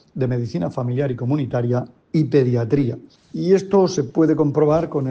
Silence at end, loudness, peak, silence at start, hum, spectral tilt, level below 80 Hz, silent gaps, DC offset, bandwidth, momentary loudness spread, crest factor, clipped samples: 0 s; -20 LUFS; -4 dBFS; 0.15 s; none; -8 dB/octave; -54 dBFS; none; under 0.1%; 7.8 kHz; 8 LU; 14 dB; under 0.1%